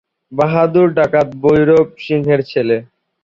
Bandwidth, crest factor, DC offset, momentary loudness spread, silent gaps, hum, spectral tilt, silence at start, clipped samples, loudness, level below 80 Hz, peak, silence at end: 7.2 kHz; 12 dB; under 0.1%; 7 LU; none; none; -8.5 dB/octave; 0.3 s; under 0.1%; -14 LUFS; -48 dBFS; -2 dBFS; 0.4 s